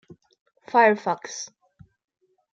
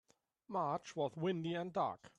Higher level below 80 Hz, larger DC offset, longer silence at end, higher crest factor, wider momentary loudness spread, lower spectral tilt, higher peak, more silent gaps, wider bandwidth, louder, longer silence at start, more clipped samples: first, -74 dBFS vs -80 dBFS; neither; first, 1.1 s vs 0.1 s; about the same, 20 dB vs 16 dB; first, 17 LU vs 3 LU; second, -3.5 dB/octave vs -6.5 dB/octave; first, -6 dBFS vs -24 dBFS; neither; second, 7.8 kHz vs 10.5 kHz; first, -21 LUFS vs -40 LUFS; first, 0.75 s vs 0.5 s; neither